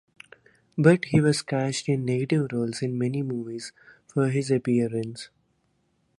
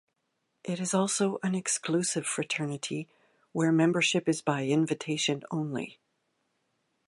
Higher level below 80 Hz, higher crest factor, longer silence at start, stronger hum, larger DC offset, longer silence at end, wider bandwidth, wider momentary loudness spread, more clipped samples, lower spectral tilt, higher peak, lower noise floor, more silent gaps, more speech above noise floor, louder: first, -62 dBFS vs -78 dBFS; about the same, 20 dB vs 20 dB; about the same, 0.75 s vs 0.65 s; neither; neither; second, 0.95 s vs 1.15 s; about the same, 11.5 kHz vs 11.5 kHz; first, 16 LU vs 12 LU; neither; first, -6.5 dB/octave vs -4 dB/octave; first, -6 dBFS vs -12 dBFS; second, -70 dBFS vs -79 dBFS; neither; second, 46 dB vs 50 dB; first, -25 LUFS vs -29 LUFS